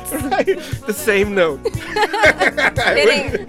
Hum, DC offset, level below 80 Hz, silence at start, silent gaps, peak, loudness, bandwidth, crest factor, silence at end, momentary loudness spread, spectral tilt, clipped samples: none; under 0.1%; -38 dBFS; 0 s; none; -2 dBFS; -16 LUFS; 16.5 kHz; 14 dB; 0 s; 9 LU; -4 dB/octave; under 0.1%